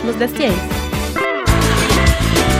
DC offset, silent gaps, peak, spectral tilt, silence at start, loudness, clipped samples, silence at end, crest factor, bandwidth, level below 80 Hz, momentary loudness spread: under 0.1%; none; 0 dBFS; -4.5 dB/octave; 0 s; -16 LUFS; under 0.1%; 0 s; 14 dB; 16 kHz; -22 dBFS; 7 LU